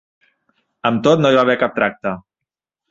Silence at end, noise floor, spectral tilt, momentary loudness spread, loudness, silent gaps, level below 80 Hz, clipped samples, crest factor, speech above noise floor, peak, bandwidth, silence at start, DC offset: 0.7 s; -84 dBFS; -6 dB/octave; 13 LU; -16 LUFS; none; -56 dBFS; under 0.1%; 18 dB; 69 dB; 0 dBFS; 7.6 kHz; 0.85 s; under 0.1%